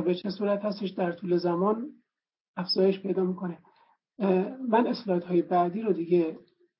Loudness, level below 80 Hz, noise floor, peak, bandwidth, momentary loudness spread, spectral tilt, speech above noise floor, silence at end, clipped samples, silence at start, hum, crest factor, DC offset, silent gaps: -28 LUFS; -80 dBFS; -65 dBFS; -10 dBFS; 5.8 kHz; 11 LU; -10.5 dB/octave; 38 dB; 0.4 s; under 0.1%; 0 s; none; 18 dB; under 0.1%; 2.40-2.54 s